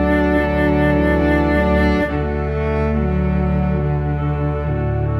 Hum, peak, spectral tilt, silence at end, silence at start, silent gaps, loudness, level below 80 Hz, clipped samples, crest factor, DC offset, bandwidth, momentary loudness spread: none; -4 dBFS; -9 dB/octave; 0 s; 0 s; none; -18 LUFS; -24 dBFS; under 0.1%; 12 dB; under 0.1%; 6 kHz; 5 LU